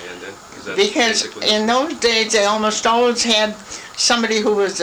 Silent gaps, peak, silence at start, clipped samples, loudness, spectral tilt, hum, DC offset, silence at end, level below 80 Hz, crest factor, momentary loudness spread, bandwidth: none; -2 dBFS; 0 s; under 0.1%; -16 LUFS; -1.5 dB/octave; none; under 0.1%; 0 s; -54 dBFS; 14 dB; 16 LU; over 20 kHz